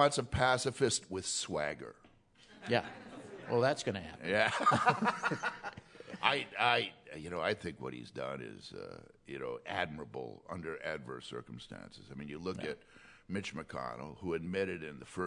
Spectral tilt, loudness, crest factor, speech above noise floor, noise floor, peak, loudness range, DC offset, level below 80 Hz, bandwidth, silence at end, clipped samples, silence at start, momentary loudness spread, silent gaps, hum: -3.5 dB/octave; -35 LUFS; 26 dB; 27 dB; -63 dBFS; -10 dBFS; 11 LU; under 0.1%; -64 dBFS; 11 kHz; 0 s; under 0.1%; 0 s; 18 LU; none; none